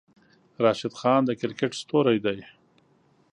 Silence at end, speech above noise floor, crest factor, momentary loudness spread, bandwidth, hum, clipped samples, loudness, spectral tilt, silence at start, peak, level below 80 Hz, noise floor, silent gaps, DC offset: 0.9 s; 39 dB; 20 dB; 7 LU; 10.5 kHz; none; under 0.1%; -25 LUFS; -6 dB/octave; 0.6 s; -6 dBFS; -68 dBFS; -63 dBFS; none; under 0.1%